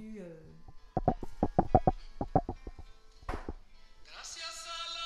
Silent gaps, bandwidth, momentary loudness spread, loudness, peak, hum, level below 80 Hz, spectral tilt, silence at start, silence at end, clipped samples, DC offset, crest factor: none; 12.5 kHz; 21 LU; -34 LUFS; -8 dBFS; none; -44 dBFS; -6 dB/octave; 0 s; 0 s; under 0.1%; under 0.1%; 28 dB